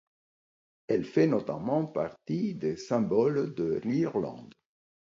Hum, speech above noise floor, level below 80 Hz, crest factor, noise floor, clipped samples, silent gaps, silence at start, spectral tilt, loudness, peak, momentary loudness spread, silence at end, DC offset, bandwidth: none; over 61 dB; -66 dBFS; 18 dB; under -90 dBFS; under 0.1%; none; 0.9 s; -8 dB/octave; -30 LUFS; -12 dBFS; 8 LU; 0.6 s; under 0.1%; 7.6 kHz